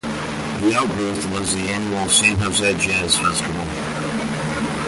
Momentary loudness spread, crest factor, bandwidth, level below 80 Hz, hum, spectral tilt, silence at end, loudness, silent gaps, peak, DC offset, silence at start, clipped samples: 10 LU; 18 dB; 12 kHz; -42 dBFS; none; -3 dB/octave; 0 s; -19 LUFS; none; -4 dBFS; under 0.1%; 0.05 s; under 0.1%